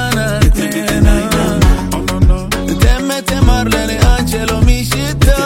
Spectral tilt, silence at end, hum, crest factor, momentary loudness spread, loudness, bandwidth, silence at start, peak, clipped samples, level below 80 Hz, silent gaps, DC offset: -5 dB/octave; 0 s; none; 12 dB; 4 LU; -13 LUFS; 16.5 kHz; 0 s; 0 dBFS; under 0.1%; -14 dBFS; none; under 0.1%